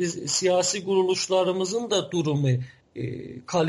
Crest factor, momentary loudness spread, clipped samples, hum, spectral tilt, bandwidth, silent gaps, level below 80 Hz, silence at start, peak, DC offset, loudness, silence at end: 14 dB; 12 LU; under 0.1%; none; -4.5 dB/octave; 11.5 kHz; none; -64 dBFS; 0 s; -10 dBFS; under 0.1%; -24 LUFS; 0 s